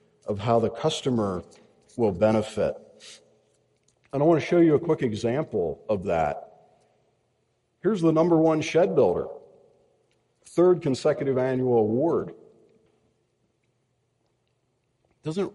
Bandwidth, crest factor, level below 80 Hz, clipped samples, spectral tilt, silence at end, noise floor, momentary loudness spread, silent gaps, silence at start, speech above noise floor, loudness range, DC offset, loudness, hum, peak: 11.5 kHz; 18 dB; -58 dBFS; under 0.1%; -7 dB/octave; 0.05 s; -72 dBFS; 12 LU; none; 0.25 s; 49 dB; 5 LU; under 0.1%; -24 LUFS; none; -8 dBFS